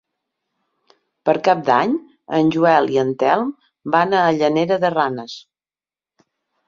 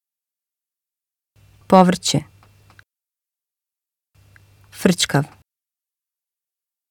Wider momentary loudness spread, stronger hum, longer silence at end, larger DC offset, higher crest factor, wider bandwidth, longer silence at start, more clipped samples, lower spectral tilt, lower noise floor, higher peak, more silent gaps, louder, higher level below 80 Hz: about the same, 12 LU vs 10 LU; neither; second, 1.25 s vs 1.65 s; neither; second, 18 dB vs 24 dB; second, 7.4 kHz vs 18 kHz; second, 1.25 s vs 1.7 s; neither; first, -6.5 dB/octave vs -5 dB/octave; about the same, under -90 dBFS vs -89 dBFS; about the same, -2 dBFS vs 0 dBFS; neither; about the same, -18 LUFS vs -17 LUFS; second, -64 dBFS vs -56 dBFS